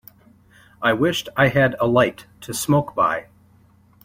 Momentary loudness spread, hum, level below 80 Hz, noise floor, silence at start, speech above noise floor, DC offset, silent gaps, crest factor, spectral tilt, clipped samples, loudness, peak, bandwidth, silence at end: 10 LU; none; -52 dBFS; -54 dBFS; 0.8 s; 35 dB; under 0.1%; none; 20 dB; -5 dB/octave; under 0.1%; -20 LUFS; -2 dBFS; 16.5 kHz; 0.8 s